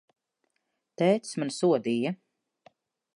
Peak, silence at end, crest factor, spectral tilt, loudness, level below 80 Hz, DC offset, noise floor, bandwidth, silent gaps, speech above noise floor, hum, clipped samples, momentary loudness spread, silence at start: -10 dBFS; 1 s; 20 dB; -6 dB/octave; -27 LUFS; -82 dBFS; under 0.1%; -80 dBFS; 11.5 kHz; none; 53 dB; none; under 0.1%; 8 LU; 1 s